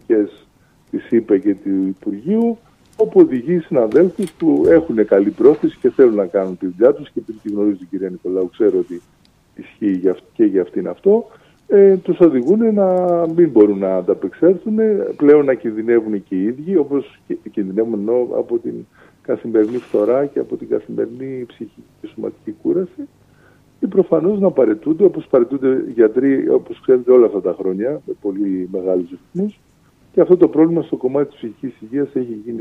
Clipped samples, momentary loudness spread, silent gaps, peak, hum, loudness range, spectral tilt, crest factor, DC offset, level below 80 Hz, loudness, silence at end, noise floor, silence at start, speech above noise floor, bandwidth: under 0.1%; 14 LU; none; 0 dBFS; none; 7 LU; -9.5 dB/octave; 16 dB; under 0.1%; -58 dBFS; -16 LUFS; 0 s; -53 dBFS; 0.1 s; 37 dB; 9.8 kHz